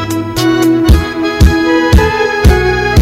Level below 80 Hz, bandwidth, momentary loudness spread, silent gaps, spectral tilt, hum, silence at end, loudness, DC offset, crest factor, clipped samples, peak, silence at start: -14 dBFS; 16 kHz; 4 LU; none; -6 dB/octave; none; 0 s; -10 LUFS; under 0.1%; 8 dB; 1%; 0 dBFS; 0 s